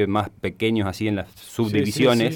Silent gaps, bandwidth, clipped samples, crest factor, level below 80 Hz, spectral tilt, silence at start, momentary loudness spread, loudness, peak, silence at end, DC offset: none; 19 kHz; under 0.1%; 14 dB; -54 dBFS; -6 dB/octave; 0 s; 10 LU; -23 LUFS; -8 dBFS; 0 s; under 0.1%